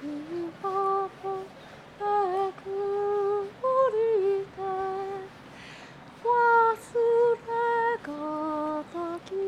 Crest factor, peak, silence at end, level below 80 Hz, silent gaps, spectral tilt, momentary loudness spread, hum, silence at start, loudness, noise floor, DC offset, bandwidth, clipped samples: 14 dB; -14 dBFS; 0 s; -66 dBFS; none; -6 dB/octave; 21 LU; none; 0 s; -27 LUFS; -47 dBFS; under 0.1%; 12 kHz; under 0.1%